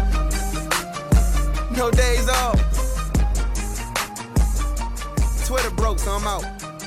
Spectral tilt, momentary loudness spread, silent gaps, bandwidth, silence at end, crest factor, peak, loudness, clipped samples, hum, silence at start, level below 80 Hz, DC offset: -4.5 dB/octave; 7 LU; none; 15 kHz; 0 s; 16 dB; -4 dBFS; -22 LUFS; under 0.1%; none; 0 s; -22 dBFS; under 0.1%